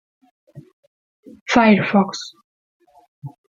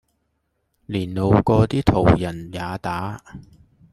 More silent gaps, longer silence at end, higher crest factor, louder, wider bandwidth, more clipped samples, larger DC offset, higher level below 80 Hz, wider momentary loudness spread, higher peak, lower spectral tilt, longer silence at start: first, 0.73-1.23 s, 1.41-1.46 s, 2.44-2.80 s, 3.08-3.22 s vs none; second, 0.25 s vs 0.5 s; about the same, 20 dB vs 20 dB; first, -16 LUFS vs -20 LUFS; second, 7.6 kHz vs 12.5 kHz; neither; neither; second, -58 dBFS vs -38 dBFS; first, 26 LU vs 13 LU; about the same, 0 dBFS vs -2 dBFS; second, -5.5 dB/octave vs -8 dB/octave; second, 0.55 s vs 0.9 s